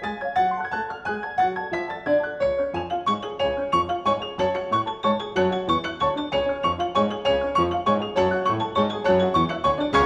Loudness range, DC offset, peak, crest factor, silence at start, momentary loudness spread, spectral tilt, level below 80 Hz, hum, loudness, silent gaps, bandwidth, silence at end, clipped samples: 3 LU; under 0.1%; -6 dBFS; 16 dB; 0 s; 5 LU; -6 dB/octave; -48 dBFS; none; -24 LUFS; none; 10 kHz; 0 s; under 0.1%